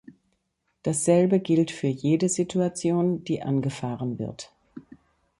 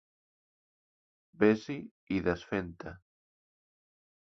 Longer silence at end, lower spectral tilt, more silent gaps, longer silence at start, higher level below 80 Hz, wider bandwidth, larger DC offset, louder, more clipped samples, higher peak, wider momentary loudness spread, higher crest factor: second, 0.6 s vs 1.35 s; about the same, -6 dB/octave vs -7 dB/octave; second, none vs 1.91-2.07 s; second, 0.1 s vs 1.4 s; about the same, -62 dBFS vs -60 dBFS; first, 11.5 kHz vs 6.4 kHz; neither; first, -25 LUFS vs -32 LUFS; neither; about the same, -8 dBFS vs -10 dBFS; second, 12 LU vs 17 LU; second, 18 dB vs 24 dB